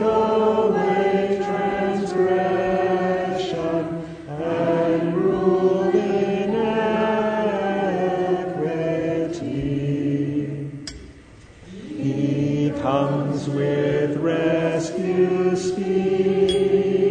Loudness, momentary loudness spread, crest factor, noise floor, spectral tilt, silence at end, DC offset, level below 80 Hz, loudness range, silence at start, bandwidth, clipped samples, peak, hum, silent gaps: -21 LUFS; 7 LU; 14 dB; -45 dBFS; -7 dB/octave; 0 s; under 0.1%; -50 dBFS; 5 LU; 0 s; 9.4 kHz; under 0.1%; -6 dBFS; none; none